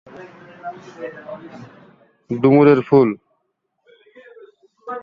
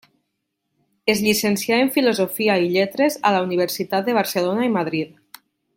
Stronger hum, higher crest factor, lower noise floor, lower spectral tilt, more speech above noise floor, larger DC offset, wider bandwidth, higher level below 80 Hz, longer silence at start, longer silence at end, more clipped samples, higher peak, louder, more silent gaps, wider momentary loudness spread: neither; about the same, 18 dB vs 18 dB; second, -72 dBFS vs -76 dBFS; first, -9.5 dB/octave vs -4.5 dB/octave; about the same, 55 dB vs 57 dB; neither; second, 5.2 kHz vs 17 kHz; about the same, -60 dBFS vs -64 dBFS; second, 0.2 s vs 1.05 s; second, 0 s vs 0.7 s; neither; about the same, -2 dBFS vs -2 dBFS; first, -14 LUFS vs -20 LUFS; neither; first, 27 LU vs 4 LU